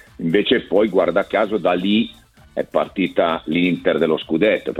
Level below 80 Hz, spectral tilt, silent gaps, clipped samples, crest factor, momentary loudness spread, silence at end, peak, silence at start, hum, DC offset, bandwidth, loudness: -52 dBFS; -7 dB/octave; none; under 0.1%; 16 dB; 5 LU; 0 s; -2 dBFS; 0.2 s; none; under 0.1%; 13 kHz; -19 LUFS